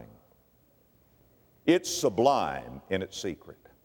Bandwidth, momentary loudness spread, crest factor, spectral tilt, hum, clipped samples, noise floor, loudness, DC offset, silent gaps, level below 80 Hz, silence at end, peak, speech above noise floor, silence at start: over 20 kHz; 13 LU; 22 dB; -4 dB/octave; none; under 0.1%; -64 dBFS; -28 LUFS; under 0.1%; none; -62 dBFS; 0.3 s; -8 dBFS; 36 dB; 0 s